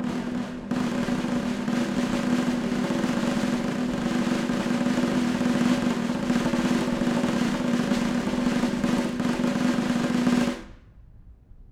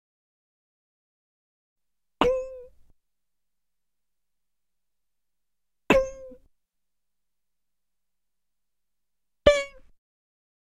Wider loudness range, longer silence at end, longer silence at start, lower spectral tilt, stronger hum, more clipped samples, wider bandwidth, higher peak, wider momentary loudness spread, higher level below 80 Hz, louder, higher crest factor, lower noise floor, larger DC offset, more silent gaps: about the same, 2 LU vs 4 LU; second, 0.05 s vs 0.95 s; second, 0 s vs 2.2 s; about the same, -5.5 dB/octave vs -4.5 dB/octave; neither; neither; about the same, 14 kHz vs 13 kHz; second, -10 dBFS vs -4 dBFS; second, 4 LU vs 20 LU; about the same, -48 dBFS vs -48 dBFS; about the same, -25 LUFS vs -24 LUFS; second, 14 dB vs 28 dB; second, -49 dBFS vs -88 dBFS; neither; neither